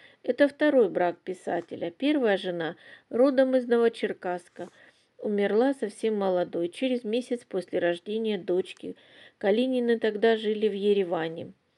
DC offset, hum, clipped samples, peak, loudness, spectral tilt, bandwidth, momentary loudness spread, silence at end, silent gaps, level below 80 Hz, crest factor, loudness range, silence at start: under 0.1%; none; under 0.1%; -8 dBFS; -27 LUFS; -6 dB/octave; 11 kHz; 13 LU; 0.25 s; none; -84 dBFS; 18 dB; 3 LU; 0.25 s